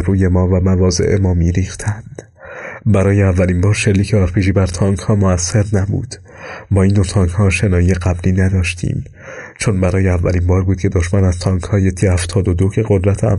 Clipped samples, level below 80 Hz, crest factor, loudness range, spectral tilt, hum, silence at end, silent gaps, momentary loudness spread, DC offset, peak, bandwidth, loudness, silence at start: under 0.1%; -30 dBFS; 10 dB; 2 LU; -6.5 dB/octave; none; 0 s; none; 12 LU; under 0.1%; -4 dBFS; 11.5 kHz; -15 LUFS; 0 s